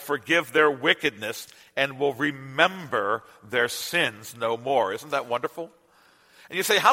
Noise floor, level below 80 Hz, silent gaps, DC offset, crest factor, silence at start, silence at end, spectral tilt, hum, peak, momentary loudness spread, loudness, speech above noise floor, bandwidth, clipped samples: -59 dBFS; -72 dBFS; none; under 0.1%; 24 dB; 0 s; 0 s; -3 dB/octave; none; -2 dBFS; 13 LU; -25 LUFS; 34 dB; 16.5 kHz; under 0.1%